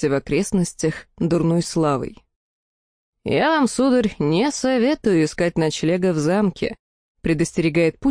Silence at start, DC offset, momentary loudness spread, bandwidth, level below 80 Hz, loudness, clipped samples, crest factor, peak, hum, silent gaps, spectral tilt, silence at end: 0 s; under 0.1%; 7 LU; 10.5 kHz; -46 dBFS; -20 LUFS; under 0.1%; 14 dB; -8 dBFS; none; 2.36-3.13 s, 6.79-7.15 s; -5.5 dB/octave; 0 s